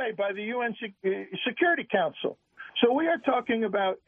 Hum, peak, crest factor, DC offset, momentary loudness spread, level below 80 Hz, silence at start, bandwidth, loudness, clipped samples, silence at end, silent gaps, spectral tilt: none; -8 dBFS; 20 dB; under 0.1%; 9 LU; -76 dBFS; 0 s; 3.7 kHz; -28 LUFS; under 0.1%; 0.1 s; none; -7.5 dB/octave